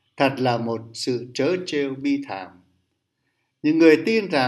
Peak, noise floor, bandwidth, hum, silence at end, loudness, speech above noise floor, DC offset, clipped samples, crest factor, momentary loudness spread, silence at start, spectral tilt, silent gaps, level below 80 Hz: -2 dBFS; -74 dBFS; 12 kHz; none; 0 s; -21 LUFS; 53 dB; under 0.1%; under 0.1%; 20 dB; 13 LU; 0.2 s; -5.5 dB/octave; none; -72 dBFS